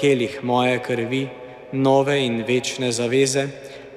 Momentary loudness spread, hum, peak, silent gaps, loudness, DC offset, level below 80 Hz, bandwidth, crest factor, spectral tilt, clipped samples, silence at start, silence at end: 12 LU; none; -6 dBFS; none; -21 LUFS; under 0.1%; -62 dBFS; 14.5 kHz; 16 dB; -4.5 dB/octave; under 0.1%; 0 s; 0 s